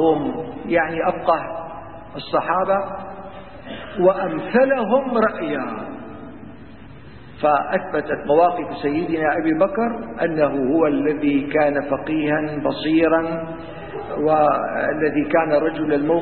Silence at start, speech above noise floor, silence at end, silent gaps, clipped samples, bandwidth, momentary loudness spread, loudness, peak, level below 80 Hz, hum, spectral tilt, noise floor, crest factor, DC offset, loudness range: 0 s; 21 dB; 0 s; none; under 0.1%; 4.4 kHz; 17 LU; -20 LUFS; -4 dBFS; -50 dBFS; none; -11 dB/octave; -41 dBFS; 16 dB; 0.7%; 3 LU